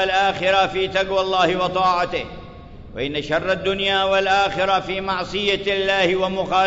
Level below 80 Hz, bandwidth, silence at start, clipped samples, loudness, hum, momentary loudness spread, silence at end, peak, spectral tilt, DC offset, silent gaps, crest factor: -44 dBFS; 7.8 kHz; 0 s; under 0.1%; -20 LUFS; none; 8 LU; 0 s; -4 dBFS; -4 dB/octave; under 0.1%; none; 16 dB